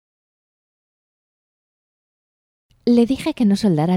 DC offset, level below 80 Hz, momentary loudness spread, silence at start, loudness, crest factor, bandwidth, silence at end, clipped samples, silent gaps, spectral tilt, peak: under 0.1%; -54 dBFS; 4 LU; 2.85 s; -18 LUFS; 18 dB; 14.5 kHz; 0 s; under 0.1%; none; -7.5 dB/octave; -4 dBFS